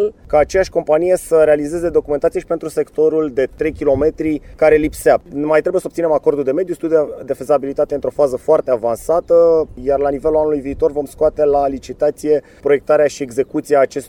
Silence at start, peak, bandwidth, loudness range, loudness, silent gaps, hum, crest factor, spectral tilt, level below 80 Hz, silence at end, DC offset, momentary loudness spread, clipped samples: 0 s; 0 dBFS; 17 kHz; 1 LU; -16 LUFS; none; none; 14 dB; -6 dB/octave; -40 dBFS; 0 s; under 0.1%; 7 LU; under 0.1%